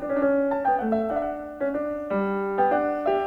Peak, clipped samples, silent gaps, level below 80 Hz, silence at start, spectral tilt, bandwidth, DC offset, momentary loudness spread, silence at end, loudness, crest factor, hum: -10 dBFS; under 0.1%; none; -54 dBFS; 0 s; -8.5 dB/octave; 5.2 kHz; under 0.1%; 6 LU; 0 s; -25 LUFS; 14 dB; none